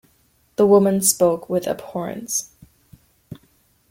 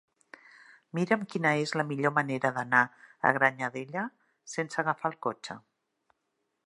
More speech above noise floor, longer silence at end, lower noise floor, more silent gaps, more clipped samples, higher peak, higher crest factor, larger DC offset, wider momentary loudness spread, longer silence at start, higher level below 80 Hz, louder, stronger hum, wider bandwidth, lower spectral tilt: second, 42 dB vs 51 dB; second, 0.55 s vs 1.05 s; second, -61 dBFS vs -80 dBFS; neither; neither; first, -2 dBFS vs -6 dBFS; second, 20 dB vs 26 dB; neither; about the same, 14 LU vs 13 LU; second, 0.6 s vs 0.95 s; first, -58 dBFS vs -80 dBFS; first, -19 LUFS vs -29 LUFS; neither; first, 16.5 kHz vs 11.5 kHz; about the same, -4.5 dB/octave vs -5.5 dB/octave